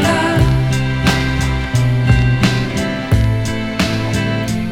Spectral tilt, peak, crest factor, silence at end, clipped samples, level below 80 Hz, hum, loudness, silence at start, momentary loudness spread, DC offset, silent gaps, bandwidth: -6 dB/octave; 0 dBFS; 14 dB; 0 s; under 0.1%; -24 dBFS; none; -16 LUFS; 0 s; 5 LU; under 0.1%; none; 15.5 kHz